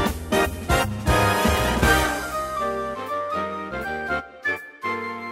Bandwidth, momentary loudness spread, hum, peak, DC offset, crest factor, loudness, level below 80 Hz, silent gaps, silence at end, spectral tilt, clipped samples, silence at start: 16 kHz; 10 LU; none; -4 dBFS; under 0.1%; 18 dB; -23 LUFS; -34 dBFS; none; 0 s; -4.5 dB/octave; under 0.1%; 0 s